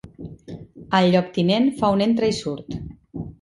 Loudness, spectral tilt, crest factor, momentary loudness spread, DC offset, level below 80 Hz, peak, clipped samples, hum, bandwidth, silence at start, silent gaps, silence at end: -20 LUFS; -6.5 dB/octave; 18 dB; 21 LU; under 0.1%; -48 dBFS; -4 dBFS; under 0.1%; none; 11.5 kHz; 0.05 s; none; 0.1 s